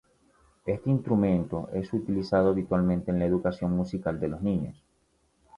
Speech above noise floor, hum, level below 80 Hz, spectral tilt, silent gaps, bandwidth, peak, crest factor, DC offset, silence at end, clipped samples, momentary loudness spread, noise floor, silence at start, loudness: 43 dB; none; -50 dBFS; -9.5 dB/octave; none; 7 kHz; -10 dBFS; 18 dB; under 0.1%; 0.85 s; under 0.1%; 8 LU; -69 dBFS; 0.65 s; -28 LUFS